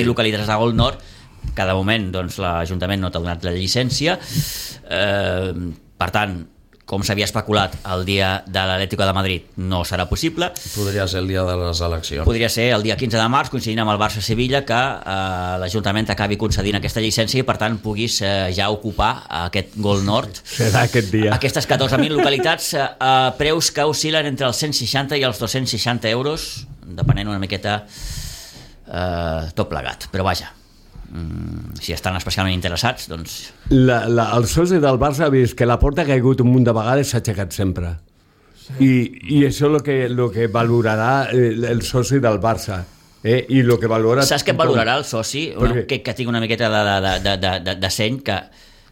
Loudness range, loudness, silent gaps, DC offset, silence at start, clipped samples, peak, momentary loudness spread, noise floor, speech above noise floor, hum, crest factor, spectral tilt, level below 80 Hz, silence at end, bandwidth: 6 LU; -19 LUFS; none; under 0.1%; 0 s; under 0.1%; -4 dBFS; 10 LU; -52 dBFS; 34 dB; none; 16 dB; -5 dB/octave; -36 dBFS; 0.45 s; 16.5 kHz